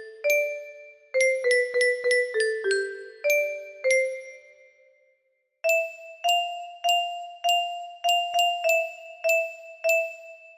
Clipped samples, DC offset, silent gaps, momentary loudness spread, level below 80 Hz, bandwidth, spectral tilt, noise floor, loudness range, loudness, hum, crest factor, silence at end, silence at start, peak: under 0.1%; under 0.1%; none; 12 LU; -78 dBFS; 15.5 kHz; 1 dB/octave; -73 dBFS; 3 LU; -25 LUFS; none; 16 dB; 0.05 s; 0 s; -10 dBFS